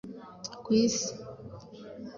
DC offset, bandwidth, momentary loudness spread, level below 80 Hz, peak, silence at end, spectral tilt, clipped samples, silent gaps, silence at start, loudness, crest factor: under 0.1%; 7.6 kHz; 21 LU; -64 dBFS; -14 dBFS; 0 s; -4 dB/octave; under 0.1%; none; 0.05 s; -28 LUFS; 18 dB